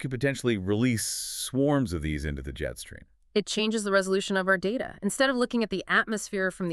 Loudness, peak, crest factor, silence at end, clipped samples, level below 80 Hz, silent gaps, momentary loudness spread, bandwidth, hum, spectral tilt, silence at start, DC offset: -27 LUFS; -10 dBFS; 18 dB; 0 s; under 0.1%; -46 dBFS; none; 9 LU; 13.5 kHz; none; -4.5 dB/octave; 0 s; under 0.1%